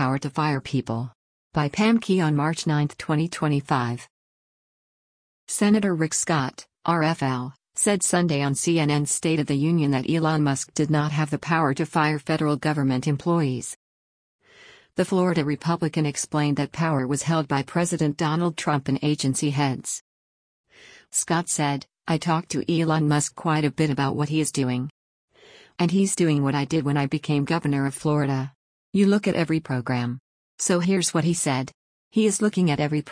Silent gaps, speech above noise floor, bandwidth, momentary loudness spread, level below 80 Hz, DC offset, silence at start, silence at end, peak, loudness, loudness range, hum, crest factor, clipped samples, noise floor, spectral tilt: 1.15-1.51 s, 4.10-5.47 s, 13.76-14.39 s, 20.01-20.64 s, 24.90-25.28 s, 28.55-28.92 s, 30.20-30.58 s, 31.74-32.11 s; 29 dB; 10.5 kHz; 7 LU; -60 dBFS; under 0.1%; 0 s; 0 s; -8 dBFS; -23 LUFS; 3 LU; none; 16 dB; under 0.1%; -52 dBFS; -5 dB/octave